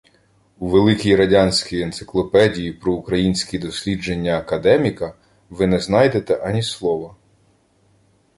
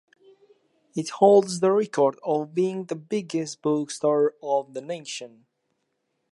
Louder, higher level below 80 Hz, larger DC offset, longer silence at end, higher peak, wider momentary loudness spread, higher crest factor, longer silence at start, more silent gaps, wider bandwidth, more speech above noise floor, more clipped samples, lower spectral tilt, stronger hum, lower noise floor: first, -18 LUFS vs -24 LUFS; first, -42 dBFS vs -80 dBFS; neither; first, 1.3 s vs 1.05 s; first, 0 dBFS vs -4 dBFS; second, 10 LU vs 15 LU; about the same, 18 dB vs 20 dB; second, 0.6 s vs 0.95 s; neither; about the same, 11.5 kHz vs 11.5 kHz; second, 41 dB vs 52 dB; neither; about the same, -5.5 dB/octave vs -5.5 dB/octave; neither; second, -59 dBFS vs -76 dBFS